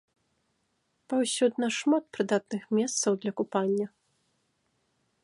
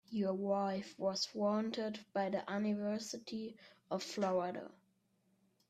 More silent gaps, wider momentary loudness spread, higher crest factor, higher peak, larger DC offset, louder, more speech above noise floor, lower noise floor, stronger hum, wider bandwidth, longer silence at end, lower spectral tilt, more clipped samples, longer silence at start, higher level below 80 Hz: neither; second, 4 LU vs 9 LU; about the same, 18 dB vs 16 dB; first, -12 dBFS vs -24 dBFS; neither; first, -28 LUFS vs -39 LUFS; first, 48 dB vs 39 dB; about the same, -75 dBFS vs -77 dBFS; neither; second, 11.5 kHz vs 14 kHz; first, 1.35 s vs 1 s; about the same, -4 dB/octave vs -5 dB/octave; neither; first, 1.1 s vs 0.1 s; about the same, -80 dBFS vs -82 dBFS